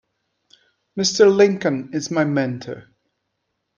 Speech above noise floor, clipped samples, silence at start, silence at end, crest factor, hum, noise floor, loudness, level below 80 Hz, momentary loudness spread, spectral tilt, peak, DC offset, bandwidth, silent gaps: 57 dB; under 0.1%; 0.95 s; 0.95 s; 18 dB; none; -75 dBFS; -18 LUFS; -66 dBFS; 20 LU; -4.5 dB/octave; -2 dBFS; under 0.1%; 7.4 kHz; none